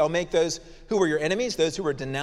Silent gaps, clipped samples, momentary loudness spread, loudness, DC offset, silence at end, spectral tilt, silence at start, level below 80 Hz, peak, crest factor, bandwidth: none; under 0.1%; 6 LU; -25 LUFS; under 0.1%; 0 s; -4.5 dB/octave; 0 s; -50 dBFS; -10 dBFS; 16 dB; 13 kHz